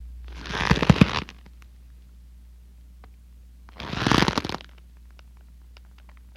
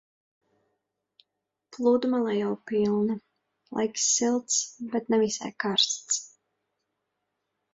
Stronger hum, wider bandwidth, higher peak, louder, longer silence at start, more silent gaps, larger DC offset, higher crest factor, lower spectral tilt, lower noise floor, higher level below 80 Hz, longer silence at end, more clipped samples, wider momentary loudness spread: first, 60 Hz at -45 dBFS vs none; first, 15 kHz vs 8 kHz; first, 0 dBFS vs -8 dBFS; first, -23 LUFS vs -26 LUFS; second, 0 s vs 1.7 s; neither; neither; first, 28 dB vs 20 dB; first, -5.5 dB/octave vs -2.5 dB/octave; second, -48 dBFS vs -83 dBFS; first, -40 dBFS vs -72 dBFS; second, 1.25 s vs 1.45 s; neither; first, 22 LU vs 7 LU